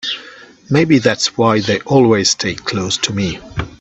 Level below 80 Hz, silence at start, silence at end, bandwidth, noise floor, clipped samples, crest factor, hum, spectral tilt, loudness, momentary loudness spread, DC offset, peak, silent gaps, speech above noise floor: -44 dBFS; 0.05 s; 0.05 s; 8.4 kHz; -39 dBFS; under 0.1%; 16 dB; none; -4.5 dB/octave; -15 LUFS; 11 LU; under 0.1%; 0 dBFS; none; 24 dB